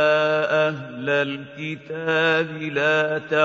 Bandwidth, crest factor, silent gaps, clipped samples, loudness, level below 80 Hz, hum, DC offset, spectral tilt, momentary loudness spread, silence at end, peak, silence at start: 7.6 kHz; 16 dB; none; under 0.1%; -22 LUFS; -70 dBFS; none; under 0.1%; -5.5 dB/octave; 11 LU; 0 s; -6 dBFS; 0 s